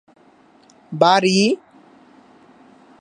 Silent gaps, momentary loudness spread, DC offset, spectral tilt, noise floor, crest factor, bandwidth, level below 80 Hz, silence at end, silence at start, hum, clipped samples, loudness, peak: none; 14 LU; under 0.1%; -4.5 dB/octave; -52 dBFS; 20 dB; 10.5 kHz; -72 dBFS; 1.45 s; 0.9 s; none; under 0.1%; -16 LUFS; -2 dBFS